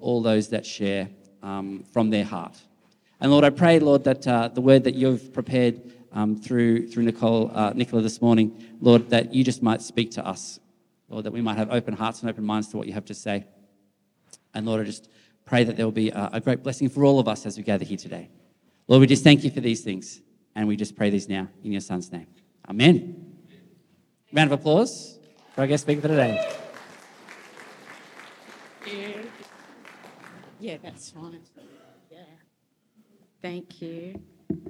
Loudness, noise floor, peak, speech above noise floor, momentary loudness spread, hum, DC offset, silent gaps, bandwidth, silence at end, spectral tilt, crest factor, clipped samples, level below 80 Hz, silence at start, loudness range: -23 LUFS; -71 dBFS; -2 dBFS; 48 dB; 22 LU; none; under 0.1%; none; 11.5 kHz; 0 s; -6 dB/octave; 22 dB; under 0.1%; -70 dBFS; 0 s; 21 LU